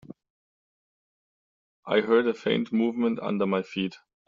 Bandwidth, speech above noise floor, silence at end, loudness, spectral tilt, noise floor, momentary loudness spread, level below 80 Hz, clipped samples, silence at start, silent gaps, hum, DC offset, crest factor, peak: 7.4 kHz; over 65 dB; 0.3 s; -26 LUFS; -4.5 dB/octave; under -90 dBFS; 8 LU; -70 dBFS; under 0.1%; 0.1 s; 0.30-1.83 s; none; under 0.1%; 22 dB; -6 dBFS